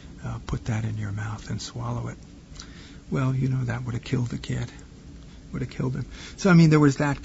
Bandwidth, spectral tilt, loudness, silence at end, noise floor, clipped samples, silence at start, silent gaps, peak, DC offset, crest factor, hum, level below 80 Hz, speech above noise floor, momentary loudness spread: 8 kHz; -7 dB/octave; -25 LUFS; 0 s; -44 dBFS; under 0.1%; 0 s; none; -6 dBFS; under 0.1%; 20 dB; none; -44 dBFS; 20 dB; 26 LU